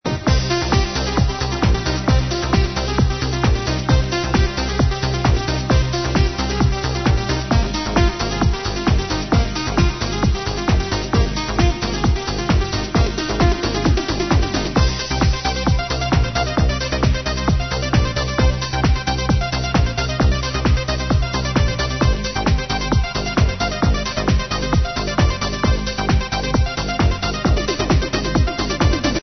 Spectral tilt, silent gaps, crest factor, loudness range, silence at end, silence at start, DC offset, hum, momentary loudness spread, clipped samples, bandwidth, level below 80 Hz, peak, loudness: -5.5 dB/octave; none; 16 dB; 1 LU; 0 s; 0.05 s; 0.3%; none; 2 LU; under 0.1%; 6.4 kHz; -22 dBFS; -2 dBFS; -19 LUFS